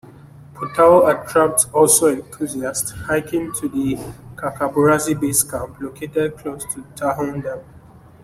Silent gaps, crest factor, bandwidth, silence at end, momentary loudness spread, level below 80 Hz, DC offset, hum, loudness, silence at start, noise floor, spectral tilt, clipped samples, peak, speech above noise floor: none; 18 dB; 16 kHz; 0.45 s; 16 LU; -50 dBFS; under 0.1%; none; -18 LUFS; 0.05 s; -44 dBFS; -4 dB/octave; under 0.1%; 0 dBFS; 26 dB